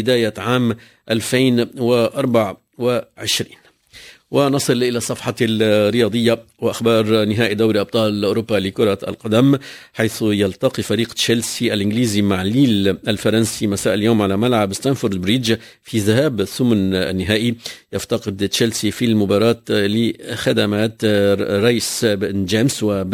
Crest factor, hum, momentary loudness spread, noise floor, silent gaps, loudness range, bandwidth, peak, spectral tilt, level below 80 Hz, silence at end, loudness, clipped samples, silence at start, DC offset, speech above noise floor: 16 dB; none; 6 LU; -43 dBFS; none; 2 LU; 16 kHz; -2 dBFS; -5 dB/octave; -46 dBFS; 0 s; -18 LUFS; under 0.1%; 0 s; under 0.1%; 26 dB